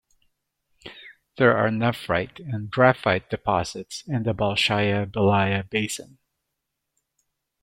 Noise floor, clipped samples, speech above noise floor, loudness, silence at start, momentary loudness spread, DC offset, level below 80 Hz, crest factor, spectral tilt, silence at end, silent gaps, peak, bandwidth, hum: -81 dBFS; under 0.1%; 58 dB; -23 LUFS; 0.85 s; 13 LU; under 0.1%; -56 dBFS; 22 dB; -5.5 dB/octave; 1.6 s; none; -2 dBFS; 16 kHz; none